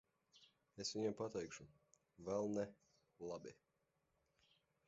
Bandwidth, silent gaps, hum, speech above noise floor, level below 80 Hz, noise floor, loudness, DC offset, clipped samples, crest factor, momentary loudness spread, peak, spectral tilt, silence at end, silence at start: 7.6 kHz; none; none; 40 dB; -80 dBFS; -86 dBFS; -47 LUFS; under 0.1%; under 0.1%; 20 dB; 16 LU; -30 dBFS; -5 dB/octave; 1.35 s; 0.35 s